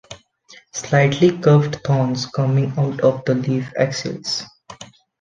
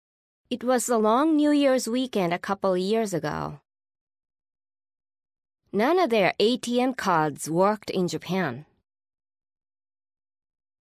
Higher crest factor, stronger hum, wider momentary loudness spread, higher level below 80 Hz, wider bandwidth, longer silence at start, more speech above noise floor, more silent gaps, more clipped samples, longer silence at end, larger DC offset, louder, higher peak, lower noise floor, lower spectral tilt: about the same, 18 dB vs 18 dB; neither; first, 16 LU vs 10 LU; first, -56 dBFS vs -66 dBFS; second, 7.6 kHz vs 16 kHz; second, 0.1 s vs 0.5 s; second, 31 dB vs over 66 dB; second, none vs 4.01-4.07 s; neither; second, 0.35 s vs 2.25 s; neither; first, -18 LUFS vs -24 LUFS; first, -2 dBFS vs -8 dBFS; second, -49 dBFS vs under -90 dBFS; about the same, -6 dB/octave vs -5 dB/octave